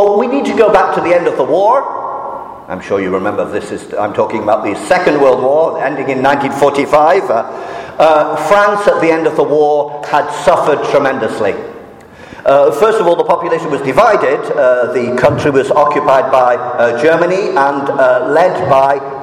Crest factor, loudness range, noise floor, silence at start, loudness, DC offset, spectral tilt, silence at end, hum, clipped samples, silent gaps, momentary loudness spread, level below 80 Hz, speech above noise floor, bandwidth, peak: 12 dB; 3 LU; -34 dBFS; 0 s; -11 LUFS; under 0.1%; -5.5 dB/octave; 0 s; none; under 0.1%; none; 9 LU; -48 dBFS; 23 dB; 15 kHz; 0 dBFS